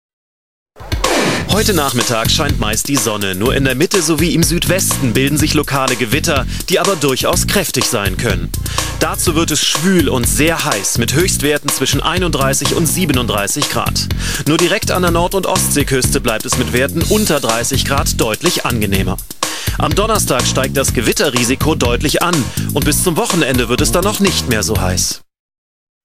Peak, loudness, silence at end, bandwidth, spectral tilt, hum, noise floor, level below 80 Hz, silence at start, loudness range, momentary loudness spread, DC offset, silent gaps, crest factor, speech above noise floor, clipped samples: 0 dBFS; -14 LUFS; 0 s; 16.5 kHz; -3.5 dB/octave; none; under -90 dBFS; -28 dBFS; 0.1 s; 1 LU; 4 LU; 2%; 0.13-0.66 s, 25.39-25.49 s, 25.58-26.01 s; 14 dB; over 76 dB; under 0.1%